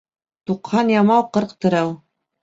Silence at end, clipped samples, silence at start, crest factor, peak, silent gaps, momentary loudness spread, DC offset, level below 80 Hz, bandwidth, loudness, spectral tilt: 0.45 s; under 0.1%; 0.5 s; 16 dB; -4 dBFS; none; 13 LU; under 0.1%; -60 dBFS; 7.8 kHz; -19 LUFS; -7 dB/octave